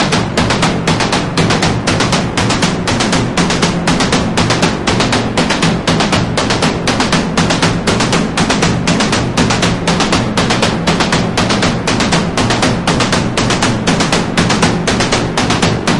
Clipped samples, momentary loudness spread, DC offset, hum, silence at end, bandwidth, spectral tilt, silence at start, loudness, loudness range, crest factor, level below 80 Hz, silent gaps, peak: under 0.1%; 1 LU; 0.8%; none; 0 s; 11.5 kHz; -4 dB/octave; 0 s; -12 LUFS; 0 LU; 12 dB; -30 dBFS; none; 0 dBFS